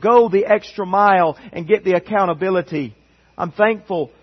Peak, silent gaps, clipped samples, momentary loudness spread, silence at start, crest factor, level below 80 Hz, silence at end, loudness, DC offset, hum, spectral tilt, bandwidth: -2 dBFS; none; under 0.1%; 13 LU; 0 s; 16 dB; -58 dBFS; 0.15 s; -17 LUFS; under 0.1%; none; -7.5 dB/octave; 6.2 kHz